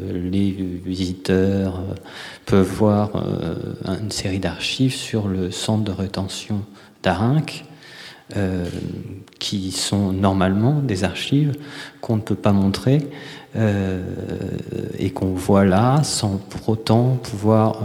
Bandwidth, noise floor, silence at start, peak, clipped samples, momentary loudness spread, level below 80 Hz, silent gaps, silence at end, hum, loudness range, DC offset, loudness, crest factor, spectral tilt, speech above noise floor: 15.5 kHz; -41 dBFS; 0 s; -2 dBFS; under 0.1%; 13 LU; -48 dBFS; none; 0 s; none; 4 LU; under 0.1%; -21 LUFS; 18 dB; -6 dB/octave; 21 dB